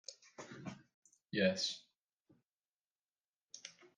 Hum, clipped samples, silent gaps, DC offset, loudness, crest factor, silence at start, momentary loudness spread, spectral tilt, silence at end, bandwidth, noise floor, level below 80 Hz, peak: none; under 0.1%; 0.94-1.02 s, 1.99-2.25 s, 2.50-2.74 s, 2.86-3.03 s, 3.28-3.33 s, 3.43-3.49 s; under 0.1%; -38 LUFS; 24 dB; 0.1 s; 21 LU; -4 dB/octave; 0.1 s; 9.8 kHz; under -90 dBFS; -88 dBFS; -20 dBFS